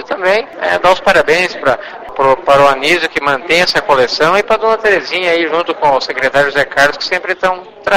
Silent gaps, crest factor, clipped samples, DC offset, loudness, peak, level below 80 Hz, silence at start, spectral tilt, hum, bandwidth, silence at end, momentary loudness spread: none; 12 dB; 0.2%; under 0.1%; -12 LUFS; 0 dBFS; -44 dBFS; 0 s; -3.5 dB/octave; none; 16 kHz; 0 s; 6 LU